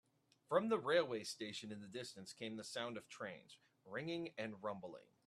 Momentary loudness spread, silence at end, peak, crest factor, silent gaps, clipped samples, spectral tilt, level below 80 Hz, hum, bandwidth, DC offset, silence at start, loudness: 13 LU; 0.25 s; -22 dBFS; 24 dB; none; under 0.1%; -4 dB/octave; -88 dBFS; none; 13 kHz; under 0.1%; 0.5 s; -44 LUFS